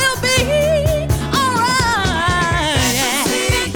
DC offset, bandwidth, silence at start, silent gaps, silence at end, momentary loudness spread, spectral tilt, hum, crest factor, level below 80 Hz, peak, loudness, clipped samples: under 0.1%; over 20 kHz; 0 s; none; 0 s; 2 LU; -3.5 dB/octave; none; 14 dB; -28 dBFS; -2 dBFS; -15 LUFS; under 0.1%